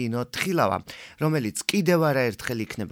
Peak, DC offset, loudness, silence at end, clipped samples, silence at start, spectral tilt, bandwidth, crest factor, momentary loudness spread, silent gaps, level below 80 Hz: -6 dBFS; under 0.1%; -25 LUFS; 0 s; under 0.1%; 0 s; -5 dB/octave; 17.5 kHz; 18 dB; 9 LU; none; -60 dBFS